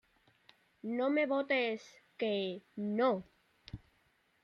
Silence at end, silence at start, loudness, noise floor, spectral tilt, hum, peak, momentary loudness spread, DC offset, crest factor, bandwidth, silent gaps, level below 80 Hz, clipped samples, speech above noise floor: 0.65 s; 0.85 s; -35 LUFS; -73 dBFS; -6 dB/octave; none; -20 dBFS; 20 LU; under 0.1%; 18 dB; 7 kHz; none; -70 dBFS; under 0.1%; 39 dB